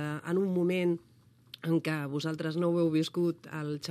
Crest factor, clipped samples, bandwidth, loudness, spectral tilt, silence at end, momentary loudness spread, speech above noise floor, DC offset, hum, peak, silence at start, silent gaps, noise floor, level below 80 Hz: 14 dB; under 0.1%; 14 kHz; -31 LUFS; -7 dB/octave; 0 s; 9 LU; 24 dB; under 0.1%; none; -16 dBFS; 0 s; none; -54 dBFS; -78 dBFS